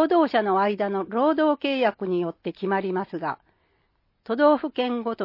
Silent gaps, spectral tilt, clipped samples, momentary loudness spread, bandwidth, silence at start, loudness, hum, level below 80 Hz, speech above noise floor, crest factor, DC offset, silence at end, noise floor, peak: none; -8.5 dB/octave; under 0.1%; 11 LU; 5.8 kHz; 0 s; -24 LUFS; none; -70 dBFS; 46 dB; 18 dB; under 0.1%; 0 s; -69 dBFS; -6 dBFS